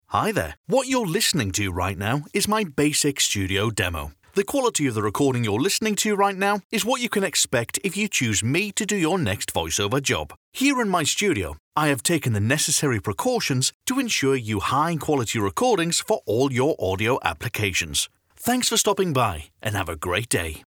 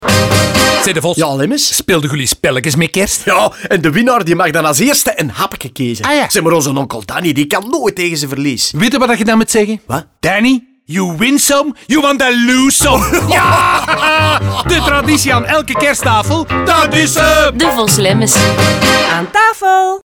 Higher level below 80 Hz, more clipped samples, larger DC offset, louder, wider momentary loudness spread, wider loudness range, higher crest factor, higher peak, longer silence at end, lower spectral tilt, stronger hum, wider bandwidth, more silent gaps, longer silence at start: second, -50 dBFS vs -32 dBFS; neither; neither; second, -22 LUFS vs -11 LUFS; about the same, 5 LU vs 7 LU; about the same, 1 LU vs 3 LU; first, 20 dB vs 12 dB; second, -4 dBFS vs 0 dBFS; about the same, 0.1 s vs 0.05 s; about the same, -3.5 dB/octave vs -3.5 dB/octave; neither; about the same, over 20 kHz vs over 20 kHz; first, 0.57-0.64 s, 6.64-6.70 s, 10.37-10.52 s, 11.60-11.72 s, 13.74-13.80 s vs none; about the same, 0.1 s vs 0 s